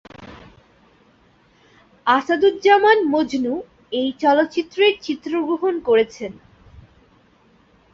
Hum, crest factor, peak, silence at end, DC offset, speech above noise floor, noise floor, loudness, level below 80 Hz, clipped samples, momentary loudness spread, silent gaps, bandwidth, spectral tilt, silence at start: none; 18 dB; -2 dBFS; 1.6 s; under 0.1%; 38 dB; -56 dBFS; -18 LUFS; -58 dBFS; under 0.1%; 14 LU; none; 7.4 kHz; -4.5 dB/octave; 0.2 s